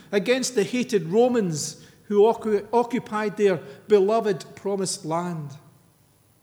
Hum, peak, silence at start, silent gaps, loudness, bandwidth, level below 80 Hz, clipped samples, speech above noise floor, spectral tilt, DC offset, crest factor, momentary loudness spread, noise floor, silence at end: none; -6 dBFS; 0.1 s; none; -23 LUFS; 16.5 kHz; -70 dBFS; under 0.1%; 37 dB; -5 dB/octave; under 0.1%; 16 dB; 10 LU; -60 dBFS; 0.85 s